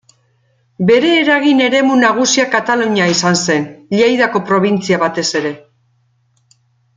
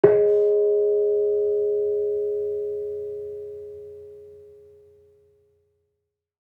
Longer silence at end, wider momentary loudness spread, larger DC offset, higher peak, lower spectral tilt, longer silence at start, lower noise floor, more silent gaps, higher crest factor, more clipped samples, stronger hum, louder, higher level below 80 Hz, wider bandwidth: second, 1.4 s vs 2.05 s; second, 7 LU vs 20 LU; neither; about the same, 0 dBFS vs -2 dBFS; second, -4 dB/octave vs -9.5 dB/octave; first, 0.8 s vs 0.05 s; second, -58 dBFS vs -80 dBFS; neither; second, 14 dB vs 22 dB; neither; neither; first, -13 LUFS vs -23 LUFS; first, -58 dBFS vs -70 dBFS; first, 9.6 kHz vs 2.9 kHz